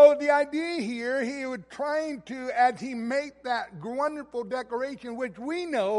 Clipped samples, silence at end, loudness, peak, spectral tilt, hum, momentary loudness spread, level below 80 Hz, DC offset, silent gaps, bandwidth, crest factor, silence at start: under 0.1%; 0 s; -28 LUFS; -6 dBFS; -4.5 dB/octave; none; 10 LU; -68 dBFS; under 0.1%; none; 11.5 kHz; 20 dB; 0 s